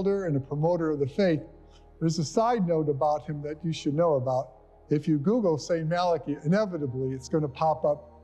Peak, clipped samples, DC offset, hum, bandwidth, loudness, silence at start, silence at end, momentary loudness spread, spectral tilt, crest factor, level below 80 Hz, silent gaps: -12 dBFS; under 0.1%; under 0.1%; none; 9.2 kHz; -27 LUFS; 0 s; 0.15 s; 6 LU; -7 dB/octave; 16 dB; -56 dBFS; none